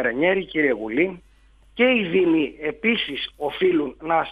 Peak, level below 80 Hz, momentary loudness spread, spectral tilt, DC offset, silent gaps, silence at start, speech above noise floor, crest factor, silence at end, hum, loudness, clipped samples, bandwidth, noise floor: -6 dBFS; -54 dBFS; 8 LU; -7 dB/octave; under 0.1%; none; 0 s; 32 dB; 16 dB; 0 s; none; -22 LUFS; under 0.1%; 4.9 kHz; -54 dBFS